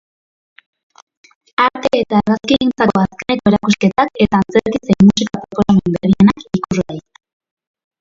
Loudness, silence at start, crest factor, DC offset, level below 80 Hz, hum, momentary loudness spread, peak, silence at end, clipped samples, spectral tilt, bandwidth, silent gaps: -14 LUFS; 1.6 s; 16 dB; under 0.1%; -42 dBFS; none; 9 LU; 0 dBFS; 1 s; under 0.1%; -6.5 dB/octave; 7.6 kHz; none